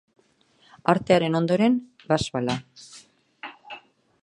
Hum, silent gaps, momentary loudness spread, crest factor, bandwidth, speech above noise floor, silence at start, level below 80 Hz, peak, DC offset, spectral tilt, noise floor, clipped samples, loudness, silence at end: none; none; 22 LU; 24 dB; 11 kHz; 40 dB; 0.85 s; -56 dBFS; -2 dBFS; under 0.1%; -6 dB/octave; -62 dBFS; under 0.1%; -23 LUFS; 0.45 s